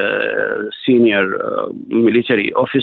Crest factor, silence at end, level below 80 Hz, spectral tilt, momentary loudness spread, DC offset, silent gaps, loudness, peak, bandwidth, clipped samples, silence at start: 12 dB; 0 s; -60 dBFS; -8.5 dB/octave; 8 LU; under 0.1%; none; -16 LUFS; -4 dBFS; 4.3 kHz; under 0.1%; 0 s